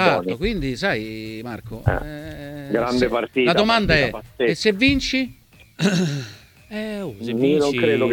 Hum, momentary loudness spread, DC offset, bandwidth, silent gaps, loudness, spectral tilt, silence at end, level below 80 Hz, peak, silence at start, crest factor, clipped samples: none; 15 LU; under 0.1%; 18.5 kHz; none; -21 LUFS; -5.5 dB/octave; 0 s; -38 dBFS; -2 dBFS; 0 s; 20 dB; under 0.1%